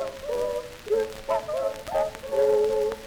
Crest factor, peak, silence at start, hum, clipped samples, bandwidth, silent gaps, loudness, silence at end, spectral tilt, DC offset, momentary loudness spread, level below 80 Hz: 14 dB; -12 dBFS; 0 s; none; under 0.1%; over 20 kHz; none; -27 LUFS; 0 s; -4 dB/octave; under 0.1%; 8 LU; -50 dBFS